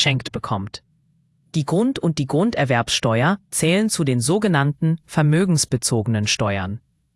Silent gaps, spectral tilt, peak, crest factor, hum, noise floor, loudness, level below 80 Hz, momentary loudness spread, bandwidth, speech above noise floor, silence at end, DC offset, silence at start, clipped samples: none; -5 dB/octave; -2 dBFS; 18 dB; none; -62 dBFS; -20 LUFS; -52 dBFS; 9 LU; 12 kHz; 42 dB; 0.4 s; under 0.1%; 0 s; under 0.1%